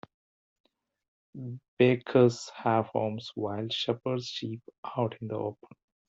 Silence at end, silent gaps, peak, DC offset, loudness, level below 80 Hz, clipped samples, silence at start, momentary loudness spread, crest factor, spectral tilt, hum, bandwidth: 0.55 s; 1.68-1.77 s, 4.78-4.83 s; -10 dBFS; under 0.1%; -29 LUFS; -72 dBFS; under 0.1%; 1.35 s; 17 LU; 22 dB; -6.5 dB/octave; none; 8 kHz